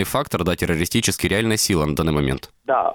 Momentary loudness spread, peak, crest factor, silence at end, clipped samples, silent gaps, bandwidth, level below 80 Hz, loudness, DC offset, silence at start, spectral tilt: 4 LU; -6 dBFS; 14 dB; 0 s; under 0.1%; none; over 20 kHz; -38 dBFS; -20 LUFS; under 0.1%; 0 s; -4.5 dB/octave